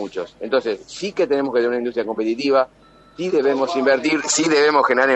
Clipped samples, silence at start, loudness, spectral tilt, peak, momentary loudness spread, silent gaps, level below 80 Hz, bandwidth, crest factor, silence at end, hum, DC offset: under 0.1%; 0 s; -19 LUFS; -3 dB/octave; -2 dBFS; 12 LU; none; -60 dBFS; 8.6 kHz; 16 dB; 0 s; none; under 0.1%